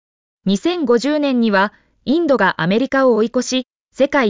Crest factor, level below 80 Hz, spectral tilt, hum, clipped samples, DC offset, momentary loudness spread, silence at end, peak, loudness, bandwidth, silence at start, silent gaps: 12 dB; -56 dBFS; -5 dB/octave; none; under 0.1%; under 0.1%; 7 LU; 0 s; -4 dBFS; -17 LUFS; 7.6 kHz; 0.45 s; 3.70-3.89 s